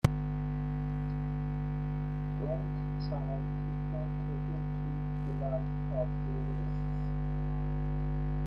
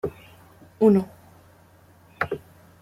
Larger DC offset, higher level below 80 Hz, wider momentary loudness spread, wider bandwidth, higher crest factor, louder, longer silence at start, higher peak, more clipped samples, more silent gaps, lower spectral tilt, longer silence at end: neither; first, -40 dBFS vs -60 dBFS; second, 2 LU vs 17 LU; second, 9 kHz vs 14.5 kHz; about the same, 24 dB vs 20 dB; second, -35 LUFS vs -23 LUFS; about the same, 0.05 s vs 0.05 s; second, -10 dBFS vs -6 dBFS; neither; neither; about the same, -9 dB/octave vs -8.5 dB/octave; second, 0 s vs 0.45 s